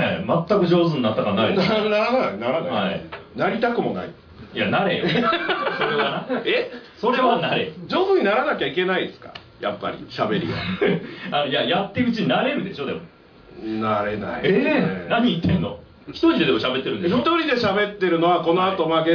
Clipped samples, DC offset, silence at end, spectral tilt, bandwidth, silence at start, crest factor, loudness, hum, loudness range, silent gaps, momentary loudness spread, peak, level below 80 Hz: under 0.1%; under 0.1%; 0 s; -7.5 dB/octave; 5.4 kHz; 0 s; 14 dB; -21 LUFS; none; 3 LU; none; 11 LU; -6 dBFS; -54 dBFS